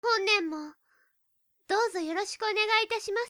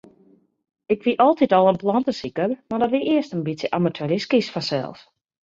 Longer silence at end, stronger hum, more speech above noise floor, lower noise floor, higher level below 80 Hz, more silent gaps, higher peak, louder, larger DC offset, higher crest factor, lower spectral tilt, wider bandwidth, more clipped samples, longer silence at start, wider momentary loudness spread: second, 0 s vs 0.5 s; neither; first, 43 dB vs 36 dB; first, -73 dBFS vs -57 dBFS; second, -76 dBFS vs -62 dBFS; neither; second, -12 dBFS vs -4 dBFS; second, -27 LUFS vs -21 LUFS; neither; about the same, 18 dB vs 18 dB; second, 0 dB/octave vs -6.5 dB/octave; first, over 20 kHz vs 7.8 kHz; neither; second, 0.05 s vs 0.9 s; about the same, 11 LU vs 9 LU